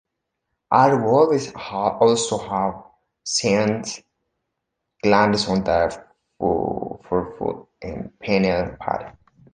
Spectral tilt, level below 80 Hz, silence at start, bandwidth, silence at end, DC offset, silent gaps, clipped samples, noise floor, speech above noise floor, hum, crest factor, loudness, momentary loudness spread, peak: -4.5 dB/octave; -48 dBFS; 0.7 s; 10 kHz; 0.4 s; under 0.1%; none; under 0.1%; -79 dBFS; 60 dB; none; 20 dB; -21 LUFS; 16 LU; -2 dBFS